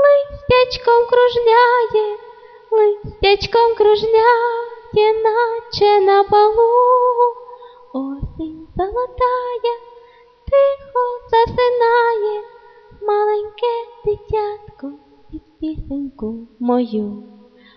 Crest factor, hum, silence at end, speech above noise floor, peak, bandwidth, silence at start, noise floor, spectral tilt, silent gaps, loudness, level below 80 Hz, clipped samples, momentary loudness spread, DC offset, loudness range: 14 dB; none; 0.55 s; 31 dB; -2 dBFS; 6.2 kHz; 0 s; -46 dBFS; -6 dB/octave; none; -16 LUFS; -42 dBFS; under 0.1%; 16 LU; under 0.1%; 9 LU